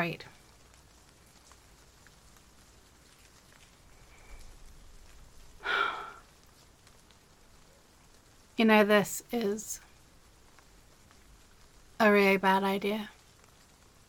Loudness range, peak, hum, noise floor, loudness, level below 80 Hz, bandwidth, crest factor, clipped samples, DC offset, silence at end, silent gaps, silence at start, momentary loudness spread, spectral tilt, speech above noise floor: 9 LU; -12 dBFS; none; -59 dBFS; -28 LUFS; -60 dBFS; 17.5 kHz; 22 dB; under 0.1%; under 0.1%; 1 s; none; 0 s; 19 LU; -4.5 dB/octave; 33 dB